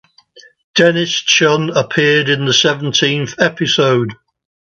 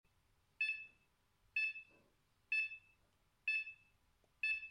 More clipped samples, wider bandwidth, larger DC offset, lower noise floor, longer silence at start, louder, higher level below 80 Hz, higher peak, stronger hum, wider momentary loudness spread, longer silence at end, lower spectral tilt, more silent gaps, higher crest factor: neither; second, 7.8 kHz vs 10.5 kHz; neither; second, -45 dBFS vs -78 dBFS; second, 0.35 s vs 0.6 s; first, -13 LUFS vs -40 LUFS; first, -58 dBFS vs -82 dBFS; first, 0 dBFS vs -30 dBFS; neither; second, 5 LU vs 13 LU; first, 0.5 s vs 0 s; first, -3.5 dB/octave vs 0 dB/octave; first, 0.64-0.74 s vs none; about the same, 14 dB vs 16 dB